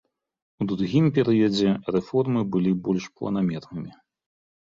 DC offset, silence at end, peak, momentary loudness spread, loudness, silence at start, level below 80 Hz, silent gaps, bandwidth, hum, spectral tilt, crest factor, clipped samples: under 0.1%; 0.85 s; -8 dBFS; 12 LU; -24 LUFS; 0.6 s; -58 dBFS; none; 7.8 kHz; none; -7.5 dB/octave; 16 dB; under 0.1%